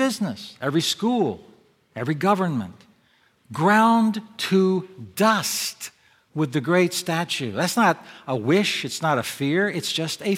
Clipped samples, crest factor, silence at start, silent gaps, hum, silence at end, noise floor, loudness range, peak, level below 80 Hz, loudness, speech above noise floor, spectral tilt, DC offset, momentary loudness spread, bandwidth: under 0.1%; 18 dB; 0 s; none; none; 0 s; -61 dBFS; 3 LU; -4 dBFS; -70 dBFS; -22 LUFS; 39 dB; -4.5 dB/octave; under 0.1%; 11 LU; 17 kHz